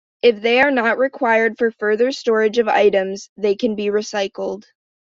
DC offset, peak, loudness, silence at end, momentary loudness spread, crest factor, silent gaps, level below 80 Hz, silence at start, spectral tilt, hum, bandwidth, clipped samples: under 0.1%; -2 dBFS; -18 LUFS; 0.4 s; 9 LU; 16 dB; 3.29-3.36 s; -62 dBFS; 0.25 s; -4 dB/octave; none; 7.6 kHz; under 0.1%